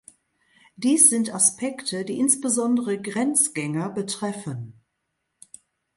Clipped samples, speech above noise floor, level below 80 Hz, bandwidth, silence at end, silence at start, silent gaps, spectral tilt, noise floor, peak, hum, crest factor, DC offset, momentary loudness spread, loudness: under 0.1%; 55 dB; -70 dBFS; 12 kHz; 1.25 s; 0.8 s; none; -3 dB/octave; -78 dBFS; -2 dBFS; none; 22 dB; under 0.1%; 14 LU; -21 LUFS